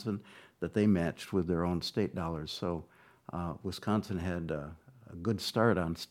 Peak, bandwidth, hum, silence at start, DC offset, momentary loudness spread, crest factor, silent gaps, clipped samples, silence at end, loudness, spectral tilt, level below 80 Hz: -12 dBFS; 16 kHz; none; 0 s; under 0.1%; 12 LU; 22 dB; none; under 0.1%; 0.05 s; -34 LUFS; -6.5 dB/octave; -56 dBFS